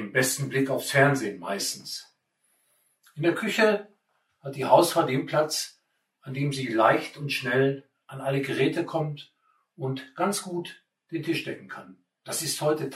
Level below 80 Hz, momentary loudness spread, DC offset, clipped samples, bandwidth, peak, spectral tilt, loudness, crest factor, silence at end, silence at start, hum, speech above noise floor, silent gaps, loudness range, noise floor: -74 dBFS; 16 LU; under 0.1%; under 0.1%; 16 kHz; -6 dBFS; -4.5 dB/octave; -26 LUFS; 22 dB; 0 s; 0 s; none; 46 dB; none; 6 LU; -72 dBFS